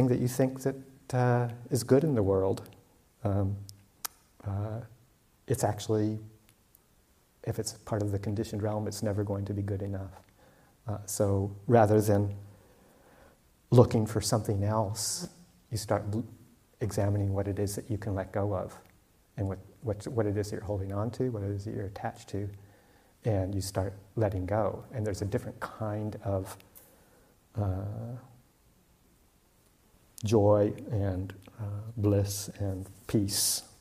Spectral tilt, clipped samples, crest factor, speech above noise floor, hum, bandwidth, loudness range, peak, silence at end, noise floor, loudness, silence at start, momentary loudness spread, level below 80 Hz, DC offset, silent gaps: -6 dB/octave; under 0.1%; 26 dB; 36 dB; none; 15.5 kHz; 7 LU; -6 dBFS; 0.15 s; -65 dBFS; -31 LUFS; 0 s; 15 LU; -58 dBFS; under 0.1%; none